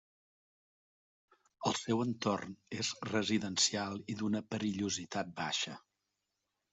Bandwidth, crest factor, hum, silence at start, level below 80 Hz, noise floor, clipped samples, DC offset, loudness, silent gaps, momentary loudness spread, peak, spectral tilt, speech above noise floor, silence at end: 8.2 kHz; 22 dB; none; 1.6 s; -74 dBFS; -86 dBFS; under 0.1%; under 0.1%; -36 LUFS; none; 9 LU; -16 dBFS; -3.5 dB/octave; 50 dB; 0.95 s